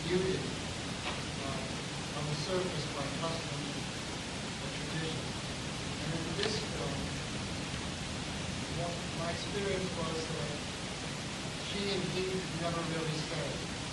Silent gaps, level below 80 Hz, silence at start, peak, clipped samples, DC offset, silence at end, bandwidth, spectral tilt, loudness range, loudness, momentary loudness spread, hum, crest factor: none; -52 dBFS; 0 s; -16 dBFS; under 0.1%; under 0.1%; 0 s; 12 kHz; -4 dB/octave; 1 LU; -36 LUFS; 4 LU; none; 20 dB